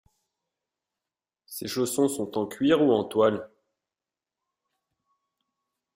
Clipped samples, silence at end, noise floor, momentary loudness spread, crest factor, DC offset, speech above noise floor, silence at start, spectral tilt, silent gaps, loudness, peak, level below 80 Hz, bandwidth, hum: under 0.1%; 2.5 s; under -90 dBFS; 14 LU; 20 dB; under 0.1%; over 66 dB; 1.5 s; -5 dB/octave; none; -25 LUFS; -10 dBFS; -70 dBFS; 16 kHz; none